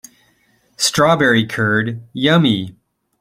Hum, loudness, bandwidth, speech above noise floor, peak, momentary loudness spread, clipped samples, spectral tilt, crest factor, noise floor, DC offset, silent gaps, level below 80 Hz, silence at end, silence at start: none; -15 LUFS; 16 kHz; 43 dB; 0 dBFS; 9 LU; under 0.1%; -4.5 dB/octave; 16 dB; -58 dBFS; under 0.1%; none; -54 dBFS; 0.5 s; 0.8 s